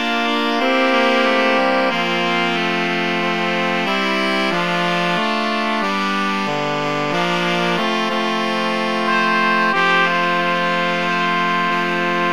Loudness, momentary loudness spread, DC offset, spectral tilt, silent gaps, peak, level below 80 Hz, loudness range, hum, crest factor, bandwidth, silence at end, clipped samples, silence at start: -17 LUFS; 4 LU; 1%; -4.5 dB/octave; none; -2 dBFS; -62 dBFS; 2 LU; none; 16 dB; 17 kHz; 0 s; under 0.1%; 0 s